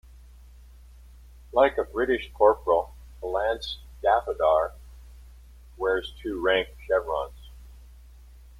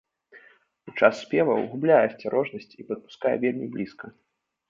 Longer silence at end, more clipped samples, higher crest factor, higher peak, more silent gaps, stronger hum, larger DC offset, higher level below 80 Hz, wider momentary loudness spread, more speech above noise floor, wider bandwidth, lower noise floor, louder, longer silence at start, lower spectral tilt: first, 0.75 s vs 0.6 s; neither; about the same, 22 dB vs 22 dB; about the same, -6 dBFS vs -4 dBFS; neither; neither; neither; first, -46 dBFS vs -72 dBFS; second, 11 LU vs 16 LU; second, 24 dB vs 32 dB; first, 14.5 kHz vs 7.6 kHz; second, -49 dBFS vs -57 dBFS; about the same, -26 LUFS vs -25 LUFS; first, 1.55 s vs 0.35 s; second, -5.5 dB/octave vs -7 dB/octave